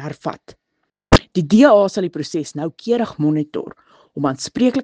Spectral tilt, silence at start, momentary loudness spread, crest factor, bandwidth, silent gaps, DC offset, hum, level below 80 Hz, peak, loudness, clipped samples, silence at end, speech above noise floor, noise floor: -6 dB/octave; 0 s; 17 LU; 18 dB; 9.8 kHz; none; under 0.1%; none; -36 dBFS; 0 dBFS; -17 LUFS; under 0.1%; 0 s; 56 dB; -73 dBFS